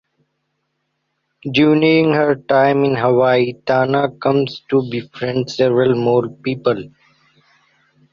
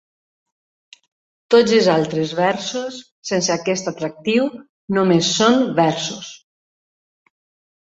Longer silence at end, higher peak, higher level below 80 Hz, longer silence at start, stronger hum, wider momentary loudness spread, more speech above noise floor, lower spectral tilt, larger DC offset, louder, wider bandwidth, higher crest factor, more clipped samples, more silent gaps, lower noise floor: second, 1.25 s vs 1.45 s; about the same, -2 dBFS vs -2 dBFS; first, -56 dBFS vs -62 dBFS; about the same, 1.45 s vs 1.5 s; neither; second, 9 LU vs 12 LU; second, 56 dB vs over 72 dB; first, -7 dB/octave vs -4.5 dB/octave; neither; about the same, -16 LUFS vs -18 LUFS; about the same, 7.4 kHz vs 8 kHz; about the same, 14 dB vs 18 dB; neither; second, none vs 3.11-3.22 s, 4.69-4.88 s; second, -71 dBFS vs under -90 dBFS